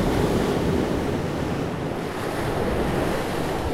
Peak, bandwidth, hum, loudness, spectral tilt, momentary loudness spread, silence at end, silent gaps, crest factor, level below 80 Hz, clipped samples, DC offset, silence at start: -10 dBFS; 16 kHz; none; -25 LUFS; -6 dB/octave; 6 LU; 0 s; none; 14 dB; -36 dBFS; under 0.1%; under 0.1%; 0 s